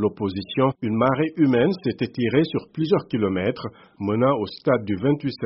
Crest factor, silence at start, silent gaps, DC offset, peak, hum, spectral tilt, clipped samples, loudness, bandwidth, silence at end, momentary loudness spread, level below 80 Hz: 16 dB; 0 s; none; under 0.1%; -6 dBFS; none; -6 dB/octave; under 0.1%; -22 LUFS; 5.8 kHz; 0 s; 6 LU; -58 dBFS